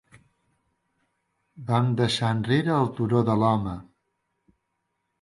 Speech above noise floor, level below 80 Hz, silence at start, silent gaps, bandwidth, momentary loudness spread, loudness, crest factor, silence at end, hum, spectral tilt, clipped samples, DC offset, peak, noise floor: 55 dB; -56 dBFS; 1.55 s; none; 11.5 kHz; 10 LU; -24 LUFS; 18 dB; 1.4 s; none; -7 dB/octave; under 0.1%; under 0.1%; -8 dBFS; -78 dBFS